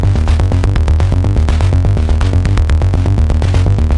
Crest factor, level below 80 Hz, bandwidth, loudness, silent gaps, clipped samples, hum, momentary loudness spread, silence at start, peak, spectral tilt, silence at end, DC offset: 10 dB; -14 dBFS; 10.5 kHz; -13 LUFS; none; under 0.1%; none; 1 LU; 0 s; 0 dBFS; -7.5 dB/octave; 0 s; under 0.1%